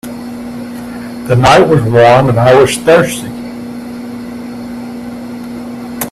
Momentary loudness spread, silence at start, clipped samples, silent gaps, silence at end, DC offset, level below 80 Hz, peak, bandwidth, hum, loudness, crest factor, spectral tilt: 18 LU; 0.05 s; under 0.1%; none; 0 s; under 0.1%; -40 dBFS; 0 dBFS; 15 kHz; 60 Hz at -25 dBFS; -8 LUFS; 12 dB; -5.5 dB/octave